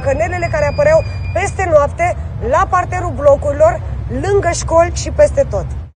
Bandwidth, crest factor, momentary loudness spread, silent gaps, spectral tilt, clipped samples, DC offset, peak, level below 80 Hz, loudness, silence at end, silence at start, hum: 10 kHz; 14 dB; 8 LU; none; -5.5 dB/octave; under 0.1%; under 0.1%; 0 dBFS; -26 dBFS; -14 LUFS; 0.05 s; 0 s; none